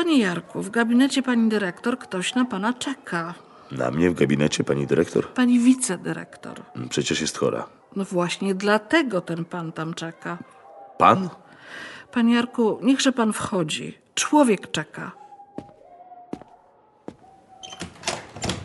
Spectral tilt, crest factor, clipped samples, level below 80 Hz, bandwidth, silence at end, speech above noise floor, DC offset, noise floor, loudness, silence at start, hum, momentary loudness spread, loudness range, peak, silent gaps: -4.5 dB/octave; 22 dB; under 0.1%; -58 dBFS; 11.5 kHz; 0 s; 34 dB; under 0.1%; -56 dBFS; -23 LUFS; 0 s; none; 19 LU; 4 LU; -2 dBFS; none